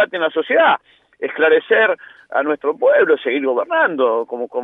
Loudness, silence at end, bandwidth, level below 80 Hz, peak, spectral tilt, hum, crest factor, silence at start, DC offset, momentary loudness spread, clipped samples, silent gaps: -16 LUFS; 0 s; 3.9 kHz; -76 dBFS; -2 dBFS; -6.5 dB/octave; none; 14 dB; 0 s; under 0.1%; 10 LU; under 0.1%; none